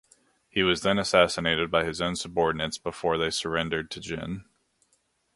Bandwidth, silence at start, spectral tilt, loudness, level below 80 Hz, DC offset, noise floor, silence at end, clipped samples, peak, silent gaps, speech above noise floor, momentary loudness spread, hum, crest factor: 11.5 kHz; 0.55 s; -4 dB/octave; -26 LUFS; -52 dBFS; under 0.1%; -71 dBFS; 0.95 s; under 0.1%; -4 dBFS; none; 44 dB; 12 LU; none; 24 dB